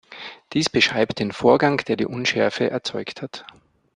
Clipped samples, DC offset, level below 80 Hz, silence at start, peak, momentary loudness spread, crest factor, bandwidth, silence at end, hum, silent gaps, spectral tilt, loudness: under 0.1%; under 0.1%; -58 dBFS; 0.1 s; -2 dBFS; 17 LU; 20 dB; 10.5 kHz; 0.55 s; none; none; -4.5 dB/octave; -21 LUFS